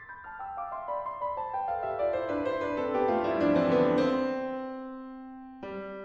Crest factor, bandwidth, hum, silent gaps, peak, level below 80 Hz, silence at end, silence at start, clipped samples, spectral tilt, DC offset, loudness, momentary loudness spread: 18 dB; 7.2 kHz; none; none; -14 dBFS; -60 dBFS; 0 s; 0 s; under 0.1%; -7.5 dB/octave; under 0.1%; -30 LUFS; 17 LU